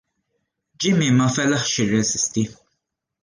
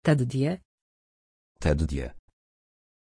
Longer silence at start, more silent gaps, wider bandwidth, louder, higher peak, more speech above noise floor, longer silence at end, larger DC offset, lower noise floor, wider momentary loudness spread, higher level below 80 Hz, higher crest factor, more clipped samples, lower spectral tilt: first, 0.8 s vs 0.05 s; second, none vs 0.65-1.55 s; about the same, 10.5 kHz vs 10.5 kHz; first, -20 LUFS vs -28 LUFS; about the same, -6 dBFS vs -8 dBFS; second, 58 dB vs over 65 dB; second, 0.7 s vs 0.85 s; neither; second, -77 dBFS vs under -90 dBFS; second, 8 LU vs 12 LU; second, -56 dBFS vs -38 dBFS; second, 14 dB vs 20 dB; neither; second, -4 dB/octave vs -7.5 dB/octave